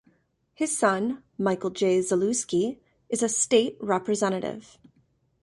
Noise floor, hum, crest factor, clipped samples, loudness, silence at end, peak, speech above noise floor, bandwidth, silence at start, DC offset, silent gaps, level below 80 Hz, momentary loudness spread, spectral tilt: -67 dBFS; none; 18 dB; under 0.1%; -26 LUFS; 0.8 s; -8 dBFS; 42 dB; 11.5 kHz; 0.6 s; under 0.1%; none; -68 dBFS; 9 LU; -4 dB/octave